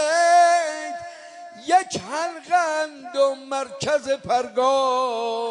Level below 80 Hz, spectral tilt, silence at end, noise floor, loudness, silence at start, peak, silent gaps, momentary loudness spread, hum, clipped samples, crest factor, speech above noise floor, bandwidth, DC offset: -68 dBFS; -2.5 dB/octave; 0 s; -41 dBFS; -21 LUFS; 0 s; -6 dBFS; none; 16 LU; none; under 0.1%; 14 dB; 18 dB; 11 kHz; under 0.1%